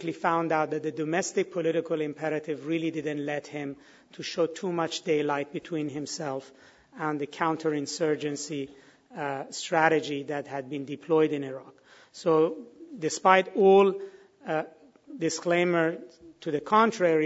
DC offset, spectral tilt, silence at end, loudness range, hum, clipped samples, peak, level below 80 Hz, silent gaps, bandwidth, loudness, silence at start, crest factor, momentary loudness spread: under 0.1%; -5 dB/octave; 0 s; 7 LU; none; under 0.1%; -4 dBFS; -76 dBFS; none; 8 kHz; -28 LUFS; 0 s; 24 dB; 16 LU